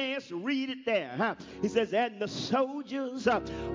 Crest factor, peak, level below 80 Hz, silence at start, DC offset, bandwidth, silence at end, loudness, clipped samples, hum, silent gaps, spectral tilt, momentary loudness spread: 18 dB; -12 dBFS; -56 dBFS; 0 s; under 0.1%; 7.6 kHz; 0 s; -31 LUFS; under 0.1%; none; none; -5 dB/octave; 6 LU